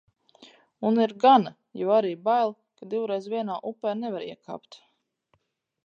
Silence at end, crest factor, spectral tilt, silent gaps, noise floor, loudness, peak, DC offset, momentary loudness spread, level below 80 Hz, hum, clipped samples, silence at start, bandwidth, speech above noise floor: 1.1 s; 20 dB; -7 dB/octave; none; -75 dBFS; -25 LUFS; -6 dBFS; under 0.1%; 19 LU; -82 dBFS; none; under 0.1%; 0.8 s; 7.2 kHz; 50 dB